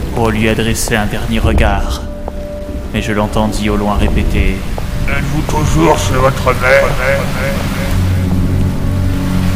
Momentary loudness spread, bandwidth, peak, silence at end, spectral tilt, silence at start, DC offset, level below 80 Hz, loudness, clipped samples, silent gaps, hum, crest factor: 10 LU; 16.5 kHz; 0 dBFS; 0 s; -5.5 dB/octave; 0 s; under 0.1%; -18 dBFS; -14 LUFS; 0.1%; none; none; 12 dB